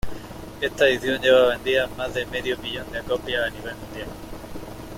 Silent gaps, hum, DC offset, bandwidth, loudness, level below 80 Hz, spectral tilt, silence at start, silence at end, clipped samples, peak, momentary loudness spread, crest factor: none; none; under 0.1%; 16.5 kHz; -22 LUFS; -44 dBFS; -4 dB/octave; 0.05 s; 0 s; under 0.1%; -6 dBFS; 20 LU; 18 dB